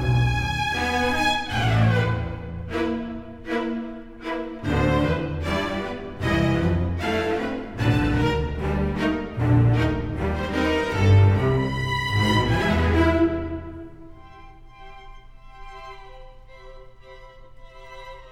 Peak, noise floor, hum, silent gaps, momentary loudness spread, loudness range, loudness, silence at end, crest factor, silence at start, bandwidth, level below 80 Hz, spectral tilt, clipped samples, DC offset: -6 dBFS; -44 dBFS; none; none; 16 LU; 6 LU; -23 LUFS; 0 s; 18 dB; 0 s; 14 kHz; -34 dBFS; -6.5 dB/octave; under 0.1%; under 0.1%